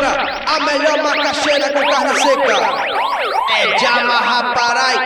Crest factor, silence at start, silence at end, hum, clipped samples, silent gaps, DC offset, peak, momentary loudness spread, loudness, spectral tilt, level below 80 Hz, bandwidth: 14 dB; 0 s; 0 s; none; under 0.1%; none; under 0.1%; -2 dBFS; 4 LU; -14 LUFS; -1.5 dB/octave; -50 dBFS; 19 kHz